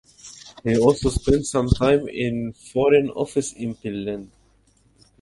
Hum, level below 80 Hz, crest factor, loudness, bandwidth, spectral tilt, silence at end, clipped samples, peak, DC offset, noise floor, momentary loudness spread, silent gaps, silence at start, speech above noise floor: none; -36 dBFS; 20 dB; -22 LUFS; 11.5 kHz; -6 dB/octave; 0.95 s; under 0.1%; -2 dBFS; under 0.1%; -59 dBFS; 13 LU; none; 0.25 s; 39 dB